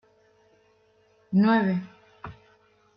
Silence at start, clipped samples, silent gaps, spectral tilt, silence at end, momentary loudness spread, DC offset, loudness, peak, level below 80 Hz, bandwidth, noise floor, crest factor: 1.3 s; under 0.1%; none; -9.5 dB/octave; 0.65 s; 24 LU; under 0.1%; -24 LUFS; -10 dBFS; -66 dBFS; 5.6 kHz; -63 dBFS; 18 dB